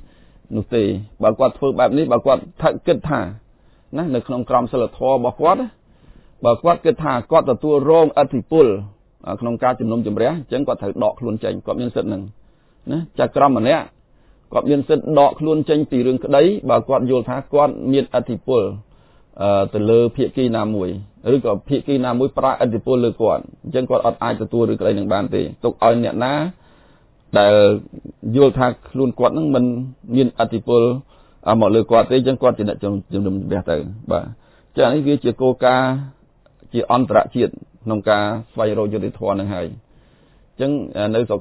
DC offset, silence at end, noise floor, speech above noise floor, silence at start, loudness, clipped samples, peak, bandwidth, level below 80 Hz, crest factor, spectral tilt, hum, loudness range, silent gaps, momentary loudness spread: under 0.1%; 0 s; -52 dBFS; 35 dB; 0.5 s; -18 LUFS; under 0.1%; 0 dBFS; 4 kHz; -46 dBFS; 18 dB; -11 dB/octave; none; 4 LU; none; 10 LU